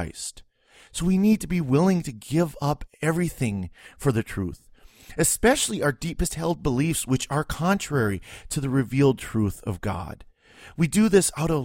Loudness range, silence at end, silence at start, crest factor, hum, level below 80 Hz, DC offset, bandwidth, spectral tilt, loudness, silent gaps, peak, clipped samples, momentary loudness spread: 2 LU; 0 s; 0 s; 20 dB; none; -42 dBFS; under 0.1%; 16.5 kHz; -5 dB/octave; -24 LUFS; none; -4 dBFS; under 0.1%; 13 LU